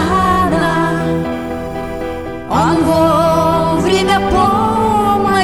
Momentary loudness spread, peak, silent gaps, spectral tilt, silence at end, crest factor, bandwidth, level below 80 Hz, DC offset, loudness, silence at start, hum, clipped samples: 11 LU; -2 dBFS; none; -6 dB/octave; 0 s; 12 dB; 16.5 kHz; -32 dBFS; under 0.1%; -14 LUFS; 0 s; none; under 0.1%